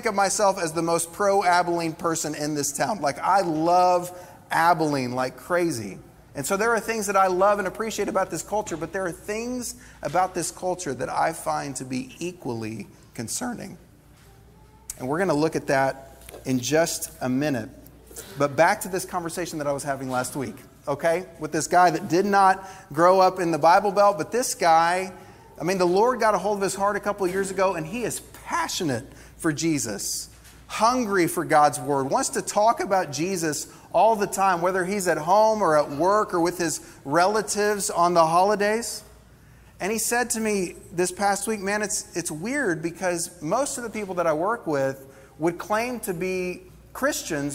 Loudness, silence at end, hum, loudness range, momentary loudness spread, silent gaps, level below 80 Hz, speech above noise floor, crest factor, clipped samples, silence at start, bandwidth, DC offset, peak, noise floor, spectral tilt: -24 LUFS; 0 s; none; 7 LU; 13 LU; none; -56 dBFS; 28 dB; 20 dB; under 0.1%; 0 s; 16 kHz; under 0.1%; -4 dBFS; -52 dBFS; -4 dB/octave